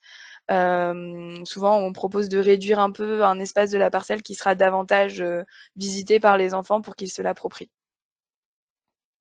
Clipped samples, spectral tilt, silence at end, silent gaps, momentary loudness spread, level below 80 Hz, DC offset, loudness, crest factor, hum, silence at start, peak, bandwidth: under 0.1%; -4.5 dB/octave; 1.55 s; none; 14 LU; -70 dBFS; under 0.1%; -22 LUFS; 20 dB; none; 0.15 s; -2 dBFS; 9.4 kHz